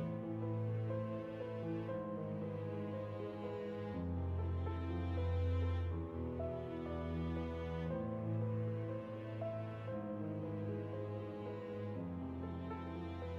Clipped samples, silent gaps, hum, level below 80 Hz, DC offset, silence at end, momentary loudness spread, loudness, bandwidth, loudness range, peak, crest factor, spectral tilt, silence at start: under 0.1%; none; none; -54 dBFS; under 0.1%; 0 s; 6 LU; -42 LUFS; 5.4 kHz; 3 LU; -28 dBFS; 12 dB; -9.5 dB/octave; 0 s